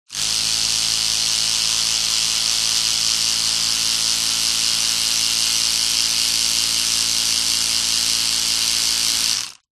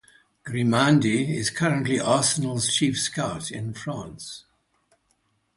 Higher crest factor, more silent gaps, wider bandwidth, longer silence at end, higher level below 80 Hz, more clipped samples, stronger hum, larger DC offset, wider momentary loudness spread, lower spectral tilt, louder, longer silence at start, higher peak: about the same, 18 dB vs 20 dB; neither; first, 13 kHz vs 11.5 kHz; second, 0.2 s vs 1.15 s; first, -48 dBFS vs -58 dBFS; neither; neither; neither; second, 1 LU vs 17 LU; second, 2 dB/octave vs -4 dB/octave; first, -16 LUFS vs -23 LUFS; second, 0.1 s vs 0.45 s; first, -2 dBFS vs -6 dBFS